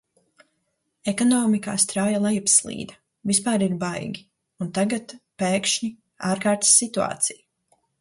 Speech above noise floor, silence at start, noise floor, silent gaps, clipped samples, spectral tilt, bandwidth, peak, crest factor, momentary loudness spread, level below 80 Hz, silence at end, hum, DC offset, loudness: 52 dB; 1.05 s; -74 dBFS; none; under 0.1%; -3 dB/octave; 11.5 kHz; -4 dBFS; 20 dB; 16 LU; -64 dBFS; 0.65 s; none; under 0.1%; -21 LUFS